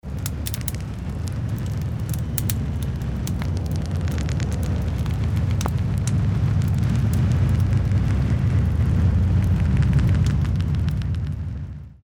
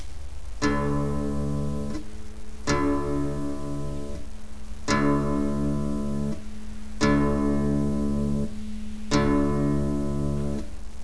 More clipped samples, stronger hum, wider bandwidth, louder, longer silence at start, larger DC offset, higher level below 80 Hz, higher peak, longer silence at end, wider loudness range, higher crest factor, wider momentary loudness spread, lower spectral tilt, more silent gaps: neither; neither; first, over 20 kHz vs 11 kHz; first, -23 LUFS vs -27 LUFS; about the same, 0.05 s vs 0 s; second, under 0.1% vs 3%; first, -28 dBFS vs -36 dBFS; first, -2 dBFS vs -8 dBFS; about the same, 0.1 s vs 0 s; about the same, 6 LU vs 4 LU; about the same, 20 dB vs 18 dB; second, 8 LU vs 18 LU; about the same, -7 dB/octave vs -6.5 dB/octave; neither